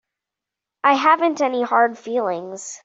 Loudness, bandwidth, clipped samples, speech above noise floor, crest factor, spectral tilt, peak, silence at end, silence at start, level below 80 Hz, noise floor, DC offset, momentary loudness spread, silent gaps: -19 LUFS; 8 kHz; under 0.1%; 67 dB; 18 dB; -3 dB/octave; -2 dBFS; 0.05 s; 0.85 s; -74 dBFS; -86 dBFS; under 0.1%; 10 LU; none